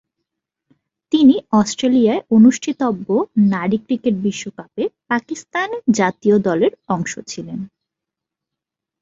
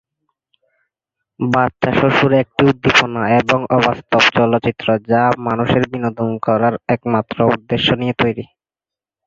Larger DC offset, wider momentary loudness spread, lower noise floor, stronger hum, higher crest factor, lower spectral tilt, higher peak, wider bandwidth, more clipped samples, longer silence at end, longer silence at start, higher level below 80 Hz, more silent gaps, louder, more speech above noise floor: neither; first, 15 LU vs 7 LU; second, -84 dBFS vs -89 dBFS; neither; about the same, 16 dB vs 16 dB; about the same, -5.5 dB/octave vs -6 dB/octave; about the same, -2 dBFS vs 0 dBFS; about the same, 7.8 kHz vs 7.6 kHz; neither; first, 1.35 s vs 0.85 s; second, 1.1 s vs 1.4 s; second, -58 dBFS vs -46 dBFS; neither; about the same, -17 LUFS vs -15 LUFS; second, 67 dB vs 74 dB